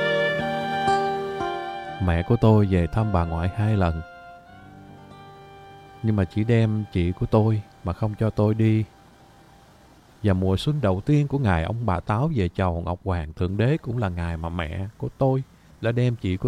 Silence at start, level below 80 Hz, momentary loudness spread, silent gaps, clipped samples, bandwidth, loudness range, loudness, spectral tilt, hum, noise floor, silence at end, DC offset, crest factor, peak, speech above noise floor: 0 s; -40 dBFS; 9 LU; none; under 0.1%; 10 kHz; 4 LU; -24 LUFS; -8 dB/octave; none; -52 dBFS; 0 s; under 0.1%; 18 dB; -4 dBFS; 30 dB